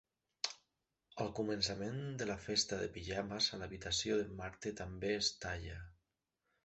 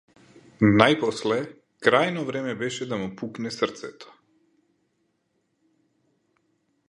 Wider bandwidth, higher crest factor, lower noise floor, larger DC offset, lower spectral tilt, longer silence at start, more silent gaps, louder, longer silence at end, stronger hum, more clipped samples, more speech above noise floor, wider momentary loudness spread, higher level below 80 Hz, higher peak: second, 8.2 kHz vs 11 kHz; about the same, 22 dB vs 26 dB; first, -87 dBFS vs -73 dBFS; neither; second, -3 dB/octave vs -5.5 dB/octave; second, 0.45 s vs 0.6 s; neither; second, -39 LUFS vs -24 LUFS; second, 0.7 s vs 2.85 s; neither; neither; about the same, 47 dB vs 49 dB; second, 10 LU vs 15 LU; about the same, -60 dBFS vs -60 dBFS; second, -20 dBFS vs 0 dBFS